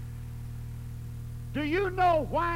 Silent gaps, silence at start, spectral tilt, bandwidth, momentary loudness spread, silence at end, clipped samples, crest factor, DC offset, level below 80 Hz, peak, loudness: none; 0 s; -7 dB/octave; 16 kHz; 15 LU; 0 s; under 0.1%; 16 dB; under 0.1%; -42 dBFS; -14 dBFS; -31 LUFS